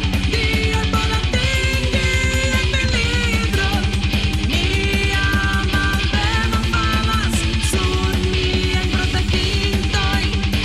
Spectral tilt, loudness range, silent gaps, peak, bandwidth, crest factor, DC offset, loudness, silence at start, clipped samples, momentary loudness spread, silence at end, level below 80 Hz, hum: -4.5 dB/octave; 1 LU; none; -6 dBFS; 15 kHz; 12 dB; under 0.1%; -18 LUFS; 0 s; under 0.1%; 1 LU; 0 s; -22 dBFS; none